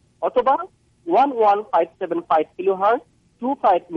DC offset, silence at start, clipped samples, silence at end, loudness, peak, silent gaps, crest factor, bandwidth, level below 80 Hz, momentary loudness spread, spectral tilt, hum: under 0.1%; 0.2 s; under 0.1%; 0 s; -20 LUFS; -6 dBFS; none; 14 dB; 6.4 kHz; -62 dBFS; 10 LU; -7 dB/octave; none